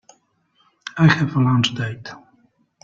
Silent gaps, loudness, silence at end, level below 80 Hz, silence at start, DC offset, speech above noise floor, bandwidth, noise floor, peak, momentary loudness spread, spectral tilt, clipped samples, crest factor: none; -18 LUFS; 0.65 s; -56 dBFS; 0.85 s; under 0.1%; 46 dB; 7.6 kHz; -63 dBFS; -2 dBFS; 20 LU; -6 dB/octave; under 0.1%; 18 dB